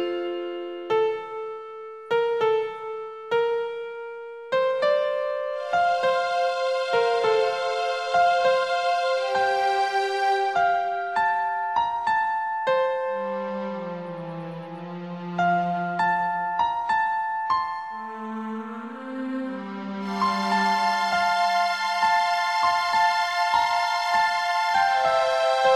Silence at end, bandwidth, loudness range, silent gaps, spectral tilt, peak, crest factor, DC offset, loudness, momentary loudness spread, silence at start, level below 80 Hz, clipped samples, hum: 0 s; 13 kHz; 6 LU; none; -4 dB/octave; -8 dBFS; 16 dB; under 0.1%; -24 LUFS; 13 LU; 0 s; -66 dBFS; under 0.1%; none